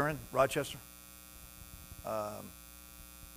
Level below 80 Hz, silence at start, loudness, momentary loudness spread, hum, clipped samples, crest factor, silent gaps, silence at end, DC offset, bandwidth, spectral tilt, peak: -58 dBFS; 0 s; -36 LUFS; 19 LU; 60 Hz at -60 dBFS; under 0.1%; 24 dB; none; 0 s; under 0.1%; 16 kHz; -4.5 dB/octave; -14 dBFS